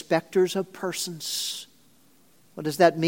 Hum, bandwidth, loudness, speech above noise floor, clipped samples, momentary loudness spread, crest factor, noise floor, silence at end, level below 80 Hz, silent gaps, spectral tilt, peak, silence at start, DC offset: none; 17 kHz; -26 LUFS; 36 dB; under 0.1%; 15 LU; 22 dB; -60 dBFS; 0 s; -76 dBFS; none; -4 dB/octave; -4 dBFS; 0.1 s; under 0.1%